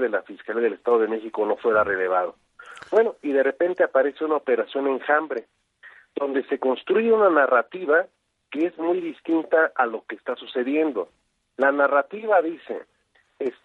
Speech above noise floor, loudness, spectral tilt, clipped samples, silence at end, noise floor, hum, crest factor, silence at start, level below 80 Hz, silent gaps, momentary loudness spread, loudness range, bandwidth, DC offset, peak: 42 dB; -23 LUFS; -6.5 dB/octave; under 0.1%; 0.15 s; -65 dBFS; none; 18 dB; 0 s; -72 dBFS; none; 12 LU; 3 LU; 4.9 kHz; under 0.1%; -6 dBFS